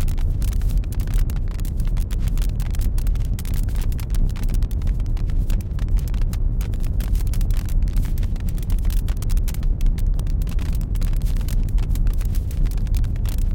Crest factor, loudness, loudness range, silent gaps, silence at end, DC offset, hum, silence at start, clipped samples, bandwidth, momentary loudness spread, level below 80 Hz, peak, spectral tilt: 12 dB; -25 LUFS; 1 LU; none; 0 s; under 0.1%; none; 0 s; under 0.1%; 17 kHz; 2 LU; -20 dBFS; -8 dBFS; -6.5 dB/octave